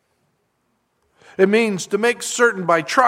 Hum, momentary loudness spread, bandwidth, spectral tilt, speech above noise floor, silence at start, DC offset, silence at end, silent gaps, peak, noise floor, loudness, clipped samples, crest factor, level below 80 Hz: none; 4 LU; 15.5 kHz; -4 dB/octave; 51 dB; 1.4 s; under 0.1%; 0 s; none; 0 dBFS; -68 dBFS; -18 LUFS; under 0.1%; 20 dB; -72 dBFS